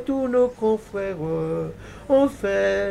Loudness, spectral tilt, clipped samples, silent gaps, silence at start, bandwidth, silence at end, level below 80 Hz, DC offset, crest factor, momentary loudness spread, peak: -23 LUFS; -6.5 dB/octave; under 0.1%; none; 0 s; 12.5 kHz; 0 s; -48 dBFS; under 0.1%; 14 dB; 9 LU; -8 dBFS